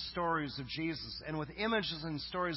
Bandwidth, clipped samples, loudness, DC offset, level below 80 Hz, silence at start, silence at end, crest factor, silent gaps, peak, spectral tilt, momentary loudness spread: 5.8 kHz; under 0.1%; -37 LUFS; under 0.1%; -58 dBFS; 0 s; 0 s; 16 dB; none; -22 dBFS; -8.5 dB/octave; 7 LU